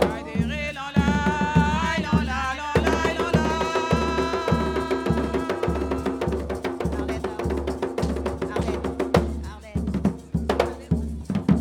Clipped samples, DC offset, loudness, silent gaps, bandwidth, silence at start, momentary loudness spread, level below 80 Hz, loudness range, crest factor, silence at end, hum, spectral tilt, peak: under 0.1%; under 0.1%; -25 LUFS; none; 15.5 kHz; 0 s; 6 LU; -34 dBFS; 4 LU; 20 dB; 0 s; none; -6.5 dB/octave; -4 dBFS